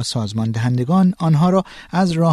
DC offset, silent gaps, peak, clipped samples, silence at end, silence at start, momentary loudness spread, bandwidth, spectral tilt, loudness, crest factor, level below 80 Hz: under 0.1%; none; -4 dBFS; under 0.1%; 0 s; 0 s; 6 LU; 12 kHz; -7 dB/octave; -18 LUFS; 12 dB; -50 dBFS